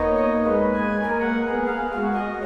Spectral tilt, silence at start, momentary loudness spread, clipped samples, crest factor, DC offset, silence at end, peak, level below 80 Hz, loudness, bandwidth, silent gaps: -8 dB/octave; 0 s; 4 LU; under 0.1%; 12 dB; under 0.1%; 0 s; -10 dBFS; -44 dBFS; -22 LUFS; 6.6 kHz; none